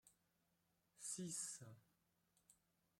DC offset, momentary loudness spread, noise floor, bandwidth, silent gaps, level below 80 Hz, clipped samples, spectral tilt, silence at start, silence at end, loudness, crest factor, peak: under 0.1%; 11 LU; -85 dBFS; 16.5 kHz; none; under -90 dBFS; under 0.1%; -3 dB/octave; 0.05 s; 0.45 s; -50 LUFS; 22 dB; -34 dBFS